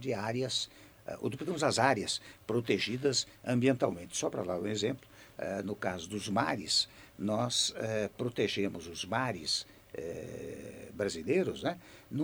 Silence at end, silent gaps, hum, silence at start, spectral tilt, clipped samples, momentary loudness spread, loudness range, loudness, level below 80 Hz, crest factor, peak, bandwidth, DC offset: 0 s; none; none; 0 s; -4 dB/octave; under 0.1%; 13 LU; 4 LU; -33 LUFS; -66 dBFS; 22 dB; -12 dBFS; over 20 kHz; under 0.1%